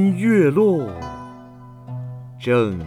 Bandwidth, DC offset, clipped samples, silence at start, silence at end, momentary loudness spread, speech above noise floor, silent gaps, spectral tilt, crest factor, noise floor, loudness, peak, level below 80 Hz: 13 kHz; under 0.1%; under 0.1%; 0 s; 0 s; 20 LU; 23 dB; none; -8 dB/octave; 14 dB; -41 dBFS; -18 LUFS; -6 dBFS; -50 dBFS